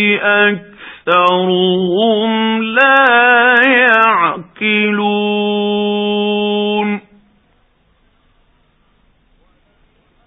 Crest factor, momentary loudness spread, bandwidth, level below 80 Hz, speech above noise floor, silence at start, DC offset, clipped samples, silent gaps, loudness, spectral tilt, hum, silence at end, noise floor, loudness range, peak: 14 dB; 9 LU; 4 kHz; -60 dBFS; 44 dB; 0 s; under 0.1%; under 0.1%; none; -12 LUFS; -7 dB/octave; none; 3.3 s; -55 dBFS; 11 LU; 0 dBFS